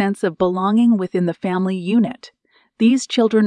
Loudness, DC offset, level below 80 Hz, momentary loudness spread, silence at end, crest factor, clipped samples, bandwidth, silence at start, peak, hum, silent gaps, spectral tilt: -18 LUFS; under 0.1%; -62 dBFS; 5 LU; 0 s; 14 dB; under 0.1%; 10.5 kHz; 0 s; -4 dBFS; none; none; -6.5 dB/octave